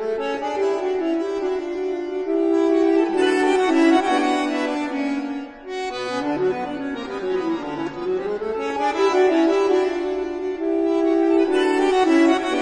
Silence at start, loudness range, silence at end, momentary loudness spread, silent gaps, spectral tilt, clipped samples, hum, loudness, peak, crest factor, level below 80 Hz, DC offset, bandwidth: 0 s; 6 LU; 0 s; 10 LU; none; -4.5 dB/octave; under 0.1%; none; -21 LUFS; -6 dBFS; 14 dB; -54 dBFS; under 0.1%; 10.5 kHz